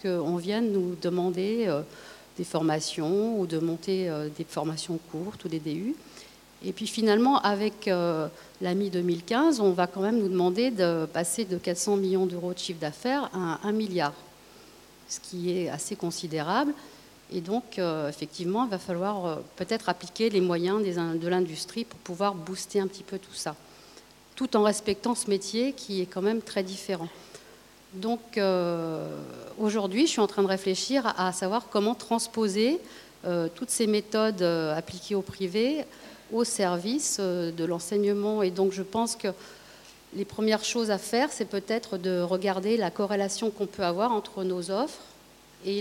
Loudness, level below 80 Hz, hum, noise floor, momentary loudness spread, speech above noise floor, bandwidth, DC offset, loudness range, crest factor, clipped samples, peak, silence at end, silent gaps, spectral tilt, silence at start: -28 LUFS; -66 dBFS; none; -54 dBFS; 11 LU; 26 dB; 17 kHz; under 0.1%; 5 LU; 20 dB; under 0.1%; -8 dBFS; 0 s; none; -4.5 dB/octave; 0 s